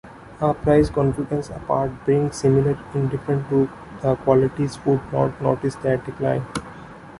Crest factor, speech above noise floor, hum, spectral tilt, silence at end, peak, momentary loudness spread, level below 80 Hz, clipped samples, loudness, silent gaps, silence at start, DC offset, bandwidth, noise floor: 18 dB; 19 dB; none; -8 dB/octave; 0 s; -4 dBFS; 8 LU; -44 dBFS; under 0.1%; -22 LUFS; none; 0.05 s; under 0.1%; 11.5 kHz; -40 dBFS